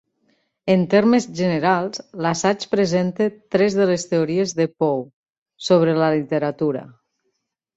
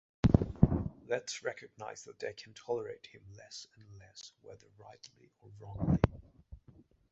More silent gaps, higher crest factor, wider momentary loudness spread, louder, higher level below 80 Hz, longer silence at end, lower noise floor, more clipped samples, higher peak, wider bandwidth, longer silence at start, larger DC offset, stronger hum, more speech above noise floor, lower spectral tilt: first, 5.13-5.24 s, 5.38-5.46 s vs none; second, 18 dB vs 28 dB; second, 9 LU vs 26 LU; first, -20 LUFS vs -34 LUFS; second, -60 dBFS vs -44 dBFS; first, 0.9 s vs 0.55 s; first, -74 dBFS vs -62 dBFS; neither; first, -4 dBFS vs -8 dBFS; about the same, 8 kHz vs 8 kHz; first, 0.65 s vs 0.25 s; neither; neither; first, 55 dB vs 23 dB; second, -6 dB/octave vs -7.5 dB/octave